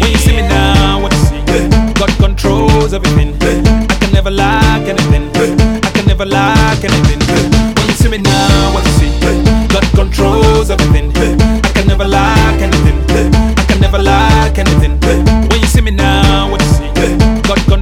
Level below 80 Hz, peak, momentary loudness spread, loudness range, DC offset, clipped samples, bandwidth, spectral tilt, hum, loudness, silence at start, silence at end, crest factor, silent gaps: -14 dBFS; 0 dBFS; 2 LU; 1 LU; under 0.1%; 0.5%; 16 kHz; -5.5 dB/octave; none; -10 LUFS; 0 s; 0 s; 8 dB; none